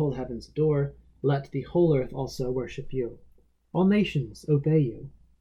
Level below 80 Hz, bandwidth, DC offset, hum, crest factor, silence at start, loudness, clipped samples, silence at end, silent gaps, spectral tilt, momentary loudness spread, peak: -48 dBFS; 11 kHz; under 0.1%; none; 16 dB; 0 s; -27 LUFS; under 0.1%; 0.3 s; none; -8.5 dB/octave; 11 LU; -12 dBFS